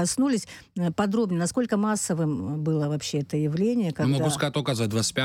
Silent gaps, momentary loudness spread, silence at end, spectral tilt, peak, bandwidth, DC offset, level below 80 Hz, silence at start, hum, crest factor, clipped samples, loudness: none; 4 LU; 0 s; -5 dB/octave; -12 dBFS; 16 kHz; under 0.1%; -60 dBFS; 0 s; none; 14 dB; under 0.1%; -26 LUFS